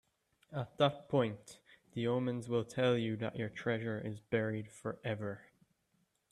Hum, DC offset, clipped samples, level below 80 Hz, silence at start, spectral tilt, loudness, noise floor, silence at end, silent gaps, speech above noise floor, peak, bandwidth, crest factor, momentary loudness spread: none; under 0.1%; under 0.1%; -74 dBFS; 0.5 s; -6.5 dB/octave; -37 LUFS; -78 dBFS; 0.9 s; none; 42 dB; -18 dBFS; 12.5 kHz; 20 dB; 12 LU